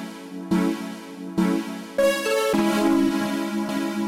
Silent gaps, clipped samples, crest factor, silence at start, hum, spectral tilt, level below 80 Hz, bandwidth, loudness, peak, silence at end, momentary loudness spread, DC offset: none; under 0.1%; 14 dB; 0 s; none; -5 dB/octave; -56 dBFS; 16.5 kHz; -23 LUFS; -8 dBFS; 0 s; 12 LU; under 0.1%